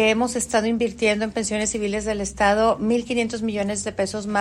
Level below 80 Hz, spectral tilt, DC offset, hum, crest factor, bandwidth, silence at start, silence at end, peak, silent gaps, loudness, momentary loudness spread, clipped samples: -46 dBFS; -3.5 dB/octave; under 0.1%; none; 16 dB; 13.5 kHz; 0 s; 0 s; -6 dBFS; none; -22 LUFS; 6 LU; under 0.1%